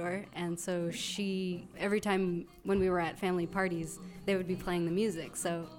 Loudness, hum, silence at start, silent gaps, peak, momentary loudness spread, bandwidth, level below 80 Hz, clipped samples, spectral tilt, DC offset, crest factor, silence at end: -34 LUFS; none; 0 s; none; -18 dBFS; 7 LU; 17 kHz; -58 dBFS; under 0.1%; -5 dB/octave; under 0.1%; 16 dB; 0 s